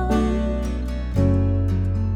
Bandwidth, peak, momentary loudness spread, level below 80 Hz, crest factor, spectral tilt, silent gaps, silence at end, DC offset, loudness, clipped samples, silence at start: 9.4 kHz; -8 dBFS; 7 LU; -26 dBFS; 12 dB; -8.5 dB/octave; none; 0 s; under 0.1%; -22 LUFS; under 0.1%; 0 s